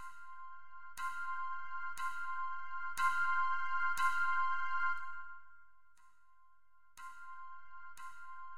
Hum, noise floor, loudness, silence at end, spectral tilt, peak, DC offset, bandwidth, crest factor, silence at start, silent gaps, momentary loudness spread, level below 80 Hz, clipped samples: none; -72 dBFS; -37 LUFS; 0 s; 0 dB/octave; -20 dBFS; 0.7%; 16 kHz; 18 dB; 0 s; none; 20 LU; -74 dBFS; under 0.1%